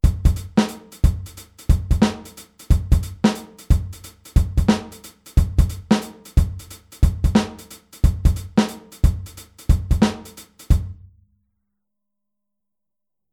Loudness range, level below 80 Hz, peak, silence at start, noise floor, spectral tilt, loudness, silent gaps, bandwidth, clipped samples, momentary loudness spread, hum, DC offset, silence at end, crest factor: 4 LU; -22 dBFS; -2 dBFS; 0.05 s; -87 dBFS; -6.5 dB/octave; -21 LUFS; none; 16 kHz; under 0.1%; 19 LU; none; under 0.1%; 2.4 s; 18 dB